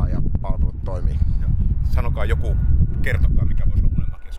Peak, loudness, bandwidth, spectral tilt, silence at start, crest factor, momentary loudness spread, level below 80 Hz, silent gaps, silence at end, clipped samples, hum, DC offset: -4 dBFS; -22 LUFS; 5 kHz; -8.5 dB/octave; 0 s; 12 dB; 5 LU; -20 dBFS; none; 0 s; under 0.1%; none; under 0.1%